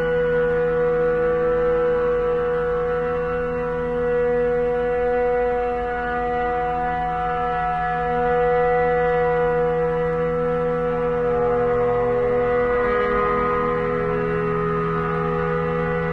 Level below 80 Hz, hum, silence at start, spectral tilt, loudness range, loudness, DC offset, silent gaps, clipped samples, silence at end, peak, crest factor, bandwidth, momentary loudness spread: -38 dBFS; none; 0 s; -8.5 dB/octave; 2 LU; -21 LUFS; under 0.1%; none; under 0.1%; 0 s; -10 dBFS; 12 dB; 4.7 kHz; 4 LU